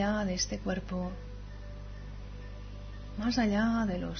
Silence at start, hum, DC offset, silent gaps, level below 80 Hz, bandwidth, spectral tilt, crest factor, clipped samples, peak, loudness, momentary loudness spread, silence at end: 0 s; 50 Hz at -45 dBFS; under 0.1%; none; -44 dBFS; 6.6 kHz; -5 dB/octave; 18 dB; under 0.1%; -16 dBFS; -32 LUFS; 17 LU; 0 s